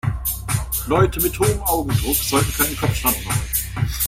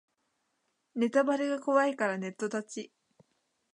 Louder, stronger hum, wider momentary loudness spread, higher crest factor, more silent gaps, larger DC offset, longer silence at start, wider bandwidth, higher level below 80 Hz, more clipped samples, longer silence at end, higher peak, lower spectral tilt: first, -20 LUFS vs -30 LUFS; neither; second, 5 LU vs 15 LU; about the same, 18 dB vs 20 dB; neither; neither; second, 0.05 s vs 0.95 s; first, 16.5 kHz vs 10.5 kHz; first, -30 dBFS vs -86 dBFS; neither; second, 0 s vs 0.85 s; first, -2 dBFS vs -12 dBFS; about the same, -4 dB/octave vs -5 dB/octave